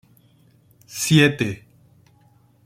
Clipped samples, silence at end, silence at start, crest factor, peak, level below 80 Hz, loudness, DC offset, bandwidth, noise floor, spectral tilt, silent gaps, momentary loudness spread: under 0.1%; 1.1 s; 0.9 s; 22 dB; -2 dBFS; -58 dBFS; -19 LUFS; under 0.1%; 16 kHz; -56 dBFS; -4.5 dB/octave; none; 20 LU